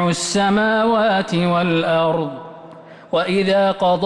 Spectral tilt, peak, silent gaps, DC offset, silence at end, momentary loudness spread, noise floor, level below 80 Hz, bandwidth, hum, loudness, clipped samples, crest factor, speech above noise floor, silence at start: -5 dB/octave; -8 dBFS; none; under 0.1%; 0 s; 7 LU; -40 dBFS; -54 dBFS; 11.5 kHz; none; -17 LUFS; under 0.1%; 10 dB; 23 dB; 0 s